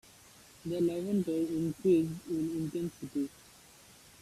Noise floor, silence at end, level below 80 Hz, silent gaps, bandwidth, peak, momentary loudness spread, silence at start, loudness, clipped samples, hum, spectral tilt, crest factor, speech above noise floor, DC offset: -57 dBFS; 0.95 s; -66 dBFS; none; 14.5 kHz; -16 dBFS; 10 LU; 0.65 s; -33 LUFS; under 0.1%; none; -7.5 dB/octave; 16 dB; 25 dB; under 0.1%